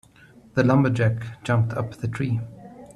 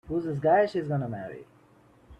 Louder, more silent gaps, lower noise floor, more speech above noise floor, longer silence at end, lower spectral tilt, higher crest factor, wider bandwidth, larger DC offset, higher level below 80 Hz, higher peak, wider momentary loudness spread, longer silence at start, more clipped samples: first, -23 LUFS vs -27 LUFS; neither; second, -51 dBFS vs -59 dBFS; about the same, 29 dB vs 32 dB; about the same, 0.05 s vs 0.05 s; about the same, -8 dB/octave vs -8.5 dB/octave; about the same, 18 dB vs 18 dB; first, 10.5 kHz vs 9 kHz; neither; about the same, -54 dBFS vs -58 dBFS; first, -4 dBFS vs -12 dBFS; second, 11 LU vs 18 LU; first, 0.55 s vs 0.05 s; neither